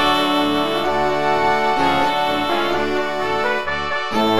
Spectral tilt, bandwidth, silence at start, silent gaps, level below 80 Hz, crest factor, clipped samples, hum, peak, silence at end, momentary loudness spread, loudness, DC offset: -4.5 dB/octave; 17 kHz; 0 s; none; -46 dBFS; 14 dB; under 0.1%; none; -4 dBFS; 0 s; 4 LU; -18 LUFS; 3%